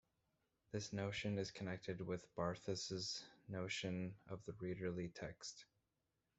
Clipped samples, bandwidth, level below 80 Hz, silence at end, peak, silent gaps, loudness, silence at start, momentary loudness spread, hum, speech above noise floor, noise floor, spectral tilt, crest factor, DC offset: under 0.1%; 8.2 kHz; -74 dBFS; 0.75 s; -26 dBFS; none; -47 LUFS; 0.75 s; 8 LU; none; 42 dB; -88 dBFS; -4.5 dB/octave; 20 dB; under 0.1%